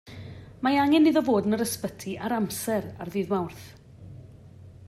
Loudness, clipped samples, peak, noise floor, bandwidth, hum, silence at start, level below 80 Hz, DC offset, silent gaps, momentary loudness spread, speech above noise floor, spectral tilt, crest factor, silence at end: -26 LUFS; under 0.1%; -10 dBFS; -48 dBFS; 15 kHz; none; 0.05 s; -58 dBFS; under 0.1%; none; 24 LU; 23 dB; -5 dB/octave; 16 dB; 0 s